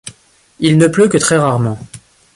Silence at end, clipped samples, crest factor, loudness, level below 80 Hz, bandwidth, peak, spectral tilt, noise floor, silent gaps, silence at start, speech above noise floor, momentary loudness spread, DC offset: 0.35 s; under 0.1%; 14 dB; -12 LUFS; -50 dBFS; 11.5 kHz; 0 dBFS; -5 dB/octave; -48 dBFS; none; 0.05 s; 36 dB; 14 LU; under 0.1%